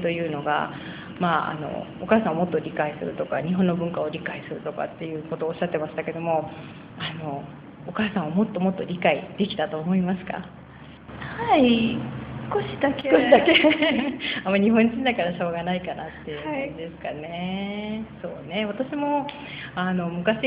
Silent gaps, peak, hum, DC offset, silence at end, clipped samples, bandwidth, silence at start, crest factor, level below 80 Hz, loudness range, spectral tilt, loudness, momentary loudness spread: none; -2 dBFS; none; under 0.1%; 0 s; under 0.1%; 5.2 kHz; 0 s; 22 dB; -56 dBFS; 9 LU; -10 dB/octave; -25 LUFS; 15 LU